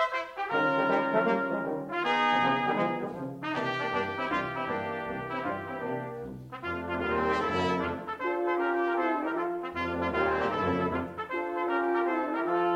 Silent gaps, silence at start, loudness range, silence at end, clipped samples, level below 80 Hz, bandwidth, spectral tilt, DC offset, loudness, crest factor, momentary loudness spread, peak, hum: none; 0 s; 5 LU; 0 s; under 0.1%; -60 dBFS; 10.5 kHz; -6.5 dB/octave; under 0.1%; -30 LUFS; 18 dB; 8 LU; -12 dBFS; none